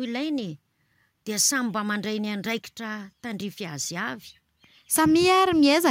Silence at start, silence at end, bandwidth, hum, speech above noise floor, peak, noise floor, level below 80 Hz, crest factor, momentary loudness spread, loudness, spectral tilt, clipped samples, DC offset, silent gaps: 0 s; 0 s; 16.5 kHz; none; 44 dB; -8 dBFS; -68 dBFS; -64 dBFS; 16 dB; 16 LU; -24 LUFS; -3 dB/octave; under 0.1%; under 0.1%; none